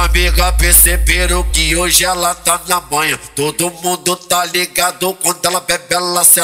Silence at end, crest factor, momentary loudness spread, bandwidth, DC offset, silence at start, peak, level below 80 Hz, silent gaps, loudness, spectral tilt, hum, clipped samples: 0 s; 14 dB; 9 LU; over 20 kHz; under 0.1%; 0 s; 0 dBFS; -20 dBFS; none; -12 LUFS; -2 dB/octave; none; 0.2%